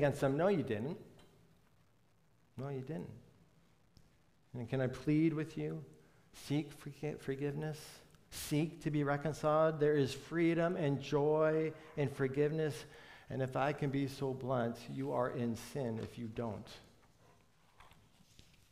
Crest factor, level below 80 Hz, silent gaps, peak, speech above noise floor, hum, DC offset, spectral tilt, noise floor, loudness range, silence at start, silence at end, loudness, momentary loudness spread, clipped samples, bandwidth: 18 dB; -68 dBFS; none; -20 dBFS; 36 dB; none; under 0.1%; -7 dB/octave; -72 dBFS; 12 LU; 0 s; 0.85 s; -37 LUFS; 16 LU; under 0.1%; 15.5 kHz